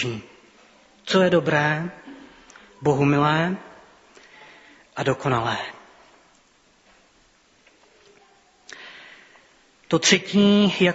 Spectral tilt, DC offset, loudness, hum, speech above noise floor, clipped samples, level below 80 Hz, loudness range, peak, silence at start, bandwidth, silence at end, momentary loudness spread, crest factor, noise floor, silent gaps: -4 dB/octave; under 0.1%; -21 LUFS; none; 39 dB; under 0.1%; -60 dBFS; 8 LU; 0 dBFS; 0 s; 8 kHz; 0 s; 24 LU; 24 dB; -59 dBFS; none